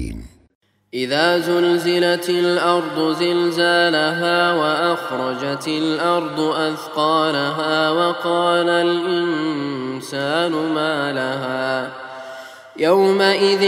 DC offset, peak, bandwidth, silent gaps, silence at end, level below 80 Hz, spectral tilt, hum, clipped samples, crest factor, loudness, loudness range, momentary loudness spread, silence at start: under 0.1%; -2 dBFS; 16 kHz; 0.55-0.61 s; 0 s; -50 dBFS; -4.5 dB/octave; none; under 0.1%; 18 dB; -18 LUFS; 4 LU; 10 LU; 0 s